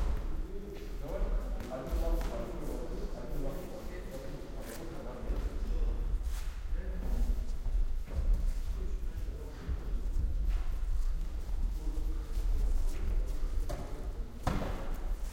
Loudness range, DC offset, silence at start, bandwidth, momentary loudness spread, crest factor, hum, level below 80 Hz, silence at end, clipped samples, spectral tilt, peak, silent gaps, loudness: 3 LU; under 0.1%; 0 s; 16 kHz; 8 LU; 18 dB; none; -34 dBFS; 0 s; under 0.1%; -6.5 dB/octave; -16 dBFS; none; -39 LUFS